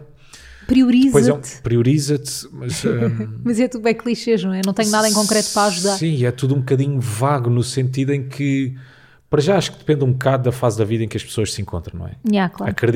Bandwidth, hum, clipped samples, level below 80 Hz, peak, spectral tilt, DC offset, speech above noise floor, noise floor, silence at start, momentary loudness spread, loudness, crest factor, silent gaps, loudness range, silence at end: 16 kHz; none; under 0.1%; -46 dBFS; -2 dBFS; -5.5 dB/octave; under 0.1%; 24 dB; -42 dBFS; 0 s; 9 LU; -18 LUFS; 16 dB; none; 2 LU; 0 s